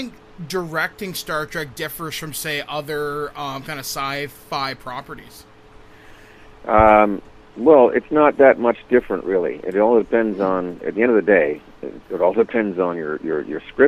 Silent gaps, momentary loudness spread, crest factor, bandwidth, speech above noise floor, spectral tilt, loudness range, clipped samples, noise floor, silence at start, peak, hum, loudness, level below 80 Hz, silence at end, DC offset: none; 17 LU; 18 dB; 15.5 kHz; 26 dB; -5 dB/octave; 11 LU; under 0.1%; -45 dBFS; 0 s; 0 dBFS; none; -19 LUFS; -46 dBFS; 0 s; under 0.1%